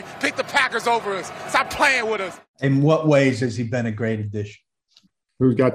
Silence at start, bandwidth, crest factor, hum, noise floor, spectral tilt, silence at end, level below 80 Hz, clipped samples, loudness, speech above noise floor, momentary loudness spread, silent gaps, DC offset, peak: 0 s; 15.5 kHz; 16 dB; none; -60 dBFS; -5.5 dB/octave; 0 s; -58 dBFS; under 0.1%; -21 LUFS; 39 dB; 11 LU; 2.48-2.54 s; under 0.1%; -4 dBFS